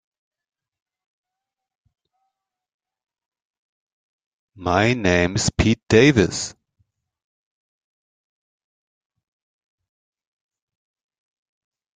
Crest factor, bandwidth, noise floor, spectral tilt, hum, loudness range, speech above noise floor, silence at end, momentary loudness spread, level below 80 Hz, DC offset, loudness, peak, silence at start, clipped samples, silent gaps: 24 dB; 9.6 kHz; -86 dBFS; -5 dB/octave; none; 10 LU; 68 dB; 5.45 s; 13 LU; -46 dBFS; under 0.1%; -18 LUFS; -2 dBFS; 4.6 s; under 0.1%; none